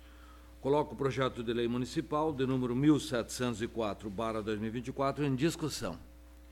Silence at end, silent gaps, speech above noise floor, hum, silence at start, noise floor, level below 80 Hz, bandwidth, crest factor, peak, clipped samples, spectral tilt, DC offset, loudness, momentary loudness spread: 0 s; none; 21 dB; none; 0 s; -53 dBFS; -54 dBFS; 16 kHz; 18 dB; -16 dBFS; under 0.1%; -6 dB/octave; under 0.1%; -33 LUFS; 8 LU